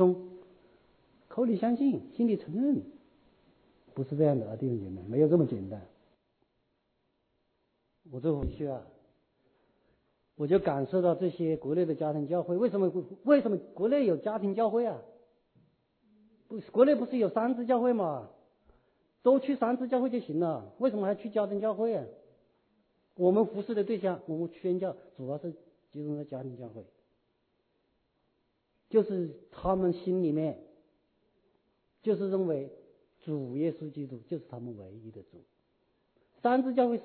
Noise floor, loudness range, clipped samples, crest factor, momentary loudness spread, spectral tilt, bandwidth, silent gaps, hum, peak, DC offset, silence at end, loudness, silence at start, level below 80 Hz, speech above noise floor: -77 dBFS; 10 LU; under 0.1%; 22 dB; 17 LU; -11.5 dB/octave; 4.5 kHz; none; none; -10 dBFS; under 0.1%; 0 s; -30 LUFS; 0 s; -60 dBFS; 47 dB